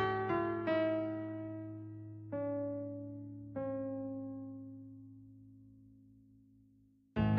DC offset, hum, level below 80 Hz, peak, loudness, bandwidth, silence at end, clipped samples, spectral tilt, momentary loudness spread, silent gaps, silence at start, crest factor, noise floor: under 0.1%; none; -60 dBFS; -22 dBFS; -40 LUFS; 5.6 kHz; 0 s; under 0.1%; -6.5 dB/octave; 22 LU; none; 0 s; 18 dB; -68 dBFS